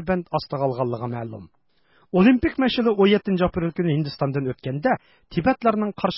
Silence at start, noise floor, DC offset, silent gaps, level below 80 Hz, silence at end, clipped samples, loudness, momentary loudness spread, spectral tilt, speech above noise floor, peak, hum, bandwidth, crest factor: 0 s; -62 dBFS; under 0.1%; none; -48 dBFS; 0 s; under 0.1%; -22 LUFS; 11 LU; -11 dB/octave; 40 dB; -6 dBFS; none; 5.8 kHz; 16 dB